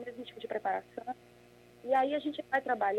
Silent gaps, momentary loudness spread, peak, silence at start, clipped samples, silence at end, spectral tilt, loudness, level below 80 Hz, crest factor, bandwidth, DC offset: none; 15 LU; -16 dBFS; 0 s; under 0.1%; 0 s; -5 dB/octave; -34 LUFS; -76 dBFS; 18 dB; 13 kHz; under 0.1%